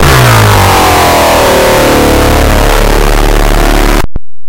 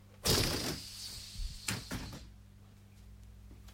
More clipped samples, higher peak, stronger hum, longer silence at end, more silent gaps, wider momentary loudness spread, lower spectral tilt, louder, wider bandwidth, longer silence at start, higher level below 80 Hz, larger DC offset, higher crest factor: neither; first, 0 dBFS vs -16 dBFS; second, none vs 50 Hz at -60 dBFS; about the same, 0 s vs 0 s; neither; second, 5 LU vs 26 LU; first, -4.5 dB/octave vs -3 dB/octave; first, -6 LUFS vs -36 LUFS; about the same, 17.5 kHz vs 16.5 kHz; about the same, 0 s vs 0 s; first, -10 dBFS vs -48 dBFS; neither; second, 6 dB vs 24 dB